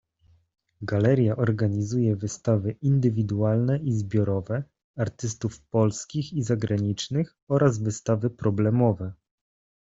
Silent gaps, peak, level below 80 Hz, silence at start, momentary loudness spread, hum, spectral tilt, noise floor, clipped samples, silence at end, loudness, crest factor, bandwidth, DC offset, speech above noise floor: 4.84-4.94 s, 7.42-7.47 s; -6 dBFS; -58 dBFS; 0.8 s; 9 LU; none; -7 dB/octave; -62 dBFS; under 0.1%; 0.7 s; -25 LUFS; 18 dB; 7.8 kHz; under 0.1%; 38 dB